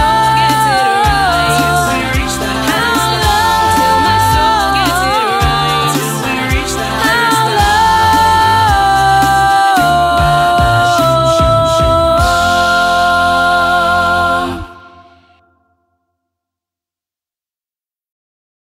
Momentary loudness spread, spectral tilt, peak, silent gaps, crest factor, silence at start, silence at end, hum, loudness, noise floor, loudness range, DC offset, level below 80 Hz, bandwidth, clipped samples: 5 LU; -4 dB/octave; 0 dBFS; none; 12 dB; 0 s; 3.9 s; none; -11 LUFS; under -90 dBFS; 4 LU; under 0.1%; -26 dBFS; 16.5 kHz; under 0.1%